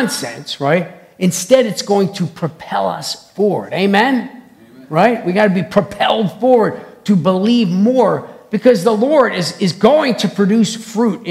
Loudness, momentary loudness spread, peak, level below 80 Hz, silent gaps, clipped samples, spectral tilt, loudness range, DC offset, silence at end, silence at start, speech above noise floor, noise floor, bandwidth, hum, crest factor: -15 LUFS; 9 LU; 0 dBFS; -58 dBFS; none; 0.2%; -5.5 dB/octave; 3 LU; under 0.1%; 0 s; 0 s; 27 dB; -41 dBFS; 15 kHz; none; 14 dB